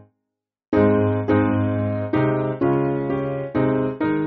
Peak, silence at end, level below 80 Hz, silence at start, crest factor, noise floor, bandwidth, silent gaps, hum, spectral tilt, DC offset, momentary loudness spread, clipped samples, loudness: -4 dBFS; 0 s; -48 dBFS; 0.7 s; 16 dB; -80 dBFS; 4.5 kHz; none; none; -8 dB/octave; under 0.1%; 6 LU; under 0.1%; -21 LUFS